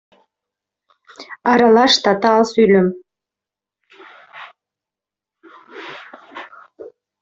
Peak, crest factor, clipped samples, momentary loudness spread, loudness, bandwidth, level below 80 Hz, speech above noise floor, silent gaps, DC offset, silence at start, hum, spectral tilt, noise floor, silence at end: -2 dBFS; 18 dB; under 0.1%; 25 LU; -14 LUFS; 7.8 kHz; -60 dBFS; 75 dB; none; under 0.1%; 1.2 s; none; -4.5 dB/octave; -88 dBFS; 0.35 s